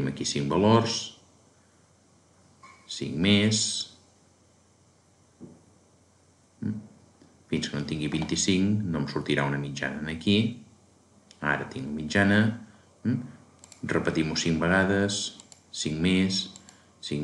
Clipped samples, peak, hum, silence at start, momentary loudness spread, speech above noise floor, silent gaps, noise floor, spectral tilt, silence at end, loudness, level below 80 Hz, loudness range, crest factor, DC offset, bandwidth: under 0.1%; -8 dBFS; none; 0 s; 16 LU; 35 dB; none; -61 dBFS; -4.5 dB/octave; 0 s; -27 LUFS; -56 dBFS; 10 LU; 22 dB; under 0.1%; 11.5 kHz